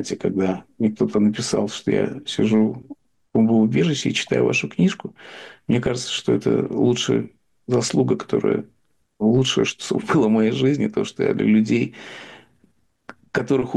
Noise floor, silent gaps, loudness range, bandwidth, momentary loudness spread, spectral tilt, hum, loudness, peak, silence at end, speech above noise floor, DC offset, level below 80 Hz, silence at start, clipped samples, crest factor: -62 dBFS; none; 2 LU; 10.5 kHz; 10 LU; -5.5 dB/octave; none; -21 LUFS; -8 dBFS; 0 s; 42 dB; under 0.1%; -56 dBFS; 0 s; under 0.1%; 12 dB